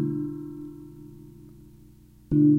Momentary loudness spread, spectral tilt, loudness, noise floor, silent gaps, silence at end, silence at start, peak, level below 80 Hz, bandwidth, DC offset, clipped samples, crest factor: 24 LU; -11.5 dB/octave; -29 LUFS; -52 dBFS; none; 0 s; 0 s; -10 dBFS; -52 dBFS; 1.7 kHz; under 0.1%; under 0.1%; 18 dB